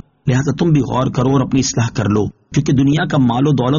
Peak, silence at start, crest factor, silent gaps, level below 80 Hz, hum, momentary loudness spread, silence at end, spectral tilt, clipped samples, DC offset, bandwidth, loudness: -2 dBFS; 0.25 s; 12 dB; none; -40 dBFS; none; 4 LU; 0 s; -7 dB/octave; under 0.1%; 0.2%; 7.4 kHz; -15 LUFS